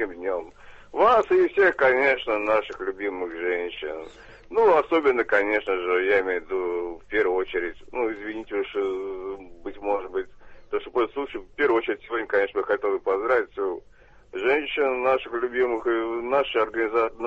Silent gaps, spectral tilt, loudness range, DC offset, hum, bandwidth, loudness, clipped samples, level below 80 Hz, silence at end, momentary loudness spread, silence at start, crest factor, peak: none; -5.5 dB/octave; 7 LU; under 0.1%; none; 7.6 kHz; -24 LUFS; under 0.1%; -56 dBFS; 0 s; 13 LU; 0 s; 18 dB; -6 dBFS